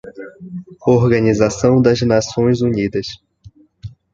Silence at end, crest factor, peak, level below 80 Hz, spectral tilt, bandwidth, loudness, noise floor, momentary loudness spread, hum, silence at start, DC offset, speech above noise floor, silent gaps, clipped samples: 0.25 s; 16 dB; -2 dBFS; -42 dBFS; -6.5 dB/octave; 7.8 kHz; -15 LUFS; -45 dBFS; 23 LU; none; 0.05 s; under 0.1%; 30 dB; none; under 0.1%